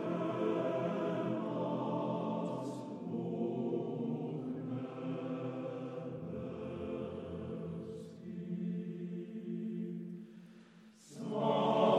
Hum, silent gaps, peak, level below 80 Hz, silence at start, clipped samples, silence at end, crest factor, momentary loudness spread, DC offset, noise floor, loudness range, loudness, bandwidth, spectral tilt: none; none; -18 dBFS; -74 dBFS; 0 s; under 0.1%; 0 s; 20 dB; 11 LU; under 0.1%; -59 dBFS; 6 LU; -39 LUFS; 10.5 kHz; -8 dB/octave